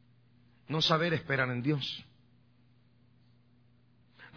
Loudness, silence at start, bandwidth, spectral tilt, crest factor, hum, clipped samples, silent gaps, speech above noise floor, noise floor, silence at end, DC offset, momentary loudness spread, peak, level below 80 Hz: -31 LUFS; 0.7 s; 5.4 kHz; -3.5 dB/octave; 24 dB; none; under 0.1%; none; 35 dB; -65 dBFS; 0 s; under 0.1%; 11 LU; -12 dBFS; -68 dBFS